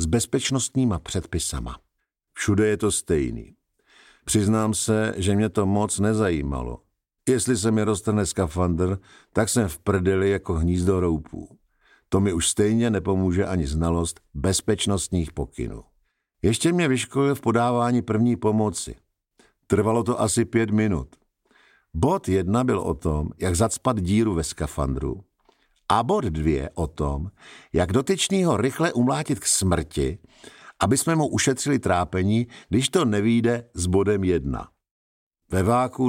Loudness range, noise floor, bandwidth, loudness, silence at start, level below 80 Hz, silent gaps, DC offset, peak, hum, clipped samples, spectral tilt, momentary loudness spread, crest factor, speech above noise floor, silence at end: 2 LU; -72 dBFS; 16.5 kHz; -23 LUFS; 0 s; -40 dBFS; 34.91-35.31 s; under 0.1%; -4 dBFS; none; under 0.1%; -5 dB/octave; 9 LU; 18 dB; 50 dB; 0 s